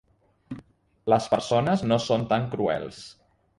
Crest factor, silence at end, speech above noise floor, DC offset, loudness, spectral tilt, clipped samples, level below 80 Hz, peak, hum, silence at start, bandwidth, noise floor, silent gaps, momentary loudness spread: 20 dB; 0.45 s; 29 dB; under 0.1%; -25 LUFS; -6 dB/octave; under 0.1%; -58 dBFS; -8 dBFS; none; 0.5 s; 11.5 kHz; -53 dBFS; none; 19 LU